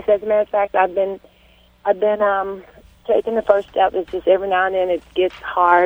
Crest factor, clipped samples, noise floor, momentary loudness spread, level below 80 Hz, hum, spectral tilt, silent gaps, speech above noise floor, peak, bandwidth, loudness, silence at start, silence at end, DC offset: 18 dB; under 0.1%; -52 dBFS; 8 LU; -52 dBFS; none; -6 dB/octave; none; 34 dB; 0 dBFS; over 20 kHz; -19 LUFS; 0 s; 0 s; under 0.1%